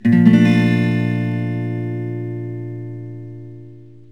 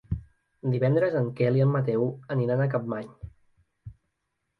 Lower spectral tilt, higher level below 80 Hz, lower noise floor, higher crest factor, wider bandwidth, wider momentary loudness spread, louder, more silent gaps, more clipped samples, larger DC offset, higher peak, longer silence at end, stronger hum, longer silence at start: second, -8.5 dB/octave vs -10.5 dB/octave; second, -64 dBFS vs -50 dBFS; second, -40 dBFS vs -79 dBFS; about the same, 18 dB vs 16 dB; first, 8.2 kHz vs 4.8 kHz; first, 23 LU vs 13 LU; first, -17 LUFS vs -26 LUFS; neither; neither; first, 0.5% vs under 0.1%; first, 0 dBFS vs -12 dBFS; second, 0.25 s vs 0.65 s; neither; about the same, 0.05 s vs 0.1 s